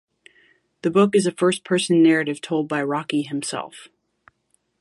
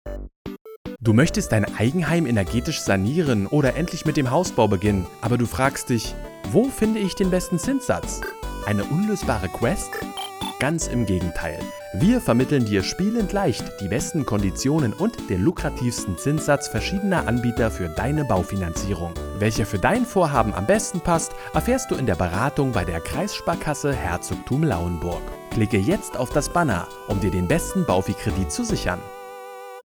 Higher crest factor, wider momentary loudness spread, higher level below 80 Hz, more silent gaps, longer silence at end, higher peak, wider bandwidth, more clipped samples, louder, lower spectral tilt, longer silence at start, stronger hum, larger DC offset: about the same, 18 dB vs 20 dB; about the same, 11 LU vs 9 LU; second, -68 dBFS vs -38 dBFS; second, none vs 0.36-0.45 s, 0.61-0.65 s, 0.76-0.85 s; first, 0.95 s vs 0.05 s; about the same, -4 dBFS vs -2 dBFS; second, 11.5 kHz vs 19.5 kHz; neither; about the same, -21 LUFS vs -23 LUFS; about the same, -5 dB/octave vs -5.5 dB/octave; first, 0.85 s vs 0.05 s; neither; neither